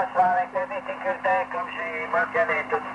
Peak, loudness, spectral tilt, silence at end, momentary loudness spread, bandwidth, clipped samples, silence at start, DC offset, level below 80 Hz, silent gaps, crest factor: -10 dBFS; -25 LUFS; -5 dB/octave; 0 s; 8 LU; 9.6 kHz; under 0.1%; 0 s; under 0.1%; -66 dBFS; none; 16 dB